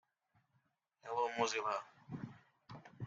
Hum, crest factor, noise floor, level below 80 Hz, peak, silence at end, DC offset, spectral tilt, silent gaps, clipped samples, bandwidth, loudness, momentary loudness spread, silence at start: none; 24 dB; -81 dBFS; -82 dBFS; -20 dBFS; 0 s; under 0.1%; -3.5 dB/octave; none; under 0.1%; 7.8 kHz; -40 LUFS; 20 LU; 1.05 s